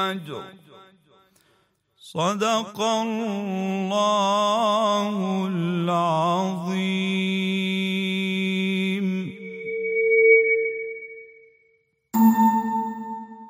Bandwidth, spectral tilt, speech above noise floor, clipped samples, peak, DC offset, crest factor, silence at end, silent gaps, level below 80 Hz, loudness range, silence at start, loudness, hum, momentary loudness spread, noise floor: 16 kHz; -5.5 dB/octave; 42 dB; under 0.1%; -6 dBFS; under 0.1%; 18 dB; 0 s; none; -76 dBFS; 5 LU; 0 s; -22 LUFS; none; 16 LU; -65 dBFS